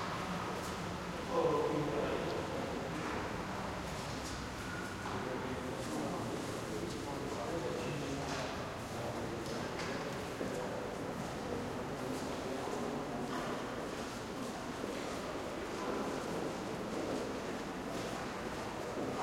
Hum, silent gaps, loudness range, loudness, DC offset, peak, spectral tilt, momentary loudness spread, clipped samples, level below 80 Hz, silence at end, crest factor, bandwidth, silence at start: none; none; 3 LU; -40 LUFS; under 0.1%; -22 dBFS; -5 dB/octave; 4 LU; under 0.1%; -58 dBFS; 0 s; 18 dB; 16 kHz; 0 s